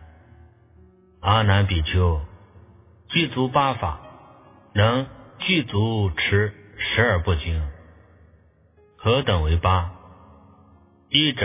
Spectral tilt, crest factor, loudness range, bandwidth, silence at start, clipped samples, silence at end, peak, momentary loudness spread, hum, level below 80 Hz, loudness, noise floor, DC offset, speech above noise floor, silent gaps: -10 dB/octave; 20 dB; 3 LU; 3.8 kHz; 0 s; under 0.1%; 0 s; -4 dBFS; 10 LU; none; -32 dBFS; -22 LUFS; -56 dBFS; under 0.1%; 36 dB; none